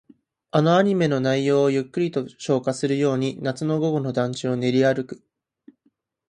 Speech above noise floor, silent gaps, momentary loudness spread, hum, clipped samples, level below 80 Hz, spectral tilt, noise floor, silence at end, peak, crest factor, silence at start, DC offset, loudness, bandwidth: 47 dB; none; 8 LU; none; under 0.1%; -66 dBFS; -6.5 dB/octave; -68 dBFS; 1.15 s; -4 dBFS; 18 dB; 0.55 s; under 0.1%; -22 LUFS; 10.5 kHz